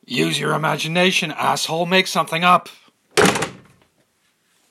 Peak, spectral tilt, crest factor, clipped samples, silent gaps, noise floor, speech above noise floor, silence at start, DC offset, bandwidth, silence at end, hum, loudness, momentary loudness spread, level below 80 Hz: 0 dBFS; -3.5 dB/octave; 20 dB; under 0.1%; none; -64 dBFS; 45 dB; 0.1 s; under 0.1%; 16 kHz; 1.15 s; none; -18 LUFS; 5 LU; -60 dBFS